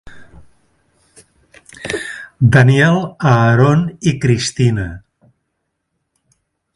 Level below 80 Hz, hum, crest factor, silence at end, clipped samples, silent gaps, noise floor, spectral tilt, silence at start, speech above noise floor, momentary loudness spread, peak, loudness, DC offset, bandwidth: -42 dBFS; none; 16 dB; 1.8 s; under 0.1%; none; -72 dBFS; -6.5 dB/octave; 0.05 s; 60 dB; 14 LU; 0 dBFS; -14 LUFS; under 0.1%; 11.5 kHz